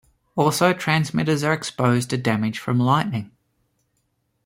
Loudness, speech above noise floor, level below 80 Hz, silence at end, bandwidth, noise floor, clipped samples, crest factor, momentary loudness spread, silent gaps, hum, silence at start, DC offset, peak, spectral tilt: -21 LUFS; 50 dB; -58 dBFS; 1.2 s; 16.5 kHz; -71 dBFS; under 0.1%; 18 dB; 5 LU; none; none; 0.35 s; under 0.1%; -4 dBFS; -5.5 dB/octave